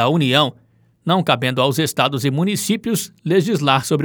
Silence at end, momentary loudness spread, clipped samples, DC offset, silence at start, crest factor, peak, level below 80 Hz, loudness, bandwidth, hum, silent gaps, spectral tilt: 0 s; 6 LU; under 0.1%; under 0.1%; 0 s; 18 dB; 0 dBFS; -64 dBFS; -18 LUFS; over 20 kHz; none; none; -5 dB/octave